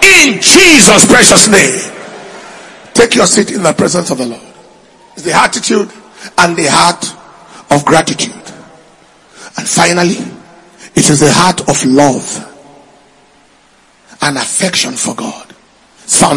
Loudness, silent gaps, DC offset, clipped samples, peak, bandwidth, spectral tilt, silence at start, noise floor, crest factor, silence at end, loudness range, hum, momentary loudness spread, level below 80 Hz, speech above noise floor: -8 LUFS; none; under 0.1%; 4%; 0 dBFS; 12 kHz; -2.5 dB/octave; 0 s; -46 dBFS; 10 dB; 0 s; 9 LU; none; 19 LU; -42 dBFS; 38 dB